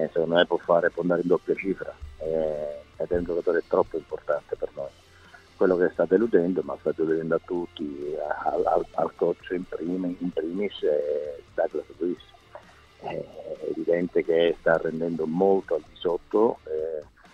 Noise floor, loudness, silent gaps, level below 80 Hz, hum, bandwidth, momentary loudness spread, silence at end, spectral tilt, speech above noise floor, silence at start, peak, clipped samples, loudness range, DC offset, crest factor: -52 dBFS; -26 LUFS; none; -54 dBFS; none; 8.2 kHz; 12 LU; 0.3 s; -7.5 dB/octave; 26 dB; 0 s; -6 dBFS; under 0.1%; 5 LU; under 0.1%; 20 dB